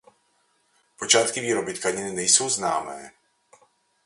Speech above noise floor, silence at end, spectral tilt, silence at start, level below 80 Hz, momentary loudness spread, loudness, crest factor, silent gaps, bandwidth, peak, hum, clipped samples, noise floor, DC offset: 43 dB; 0.95 s; -1 dB/octave; 1 s; -66 dBFS; 15 LU; -22 LUFS; 24 dB; none; 11.5 kHz; -2 dBFS; none; under 0.1%; -67 dBFS; under 0.1%